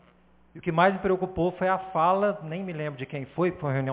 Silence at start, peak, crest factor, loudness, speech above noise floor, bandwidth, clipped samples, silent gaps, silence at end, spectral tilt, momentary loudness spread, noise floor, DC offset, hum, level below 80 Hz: 0.55 s; -6 dBFS; 20 dB; -27 LUFS; 33 dB; 4 kHz; under 0.1%; none; 0 s; -10.5 dB/octave; 11 LU; -59 dBFS; under 0.1%; none; -56 dBFS